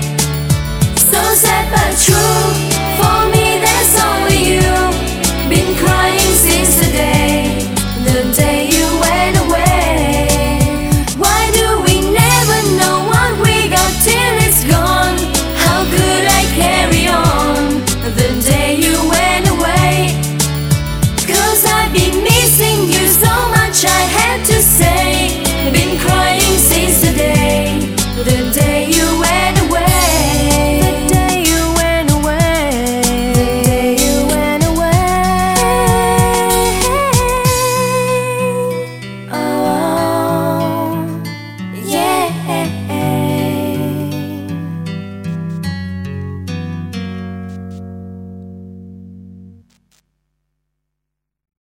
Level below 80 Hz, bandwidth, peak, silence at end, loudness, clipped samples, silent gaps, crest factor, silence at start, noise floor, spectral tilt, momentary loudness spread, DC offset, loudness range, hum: -24 dBFS; 17 kHz; 0 dBFS; 2.2 s; -12 LUFS; under 0.1%; none; 12 dB; 0 s; -78 dBFS; -4 dB/octave; 13 LU; 0.7%; 9 LU; none